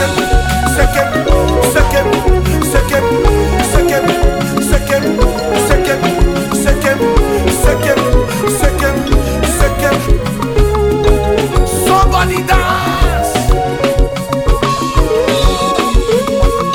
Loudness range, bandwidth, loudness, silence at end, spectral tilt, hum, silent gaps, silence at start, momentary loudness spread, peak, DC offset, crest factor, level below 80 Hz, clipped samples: 1 LU; 17.5 kHz; -12 LUFS; 0 s; -5 dB/octave; none; none; 0 s; 3 LU; 0 dBFS; under 0.1%; 10 dB; -16 dBFS; under 0.1%